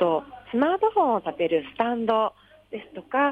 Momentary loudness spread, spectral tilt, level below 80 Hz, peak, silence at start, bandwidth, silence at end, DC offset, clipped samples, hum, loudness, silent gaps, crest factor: 16 LU; -7.5 dB/octave; -64 dBFS; -10 dBFS; 0 s; 5 kHz; 0 s; under 0.1%; under 0.1%; none; -25 LUFS; none; 14 dB